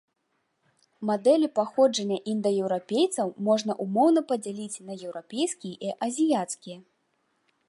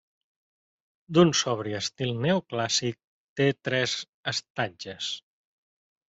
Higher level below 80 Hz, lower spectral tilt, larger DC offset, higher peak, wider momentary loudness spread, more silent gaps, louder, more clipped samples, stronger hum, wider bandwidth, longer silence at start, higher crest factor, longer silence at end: second, -80 dBFS vs -66 dBFS; about the same, -5 dB/octave vs -4 dB/octave; neither; second, -10 dBFS vs -6 dBFS; about the same, 14 LU vs 12 LU; second, none vs 3.04-3.36 s, 4.09-4.24 s, 4.50-4.55 s; about the same, -26 LUFS vs -27 LUFS; neither; neither; first, 11.5 kHz vs 8.2 kHz; about the same, 1 s vs 1.1 s; second, 18 dB vs 24 dB; about the same, 0.9 s vs 0.9 s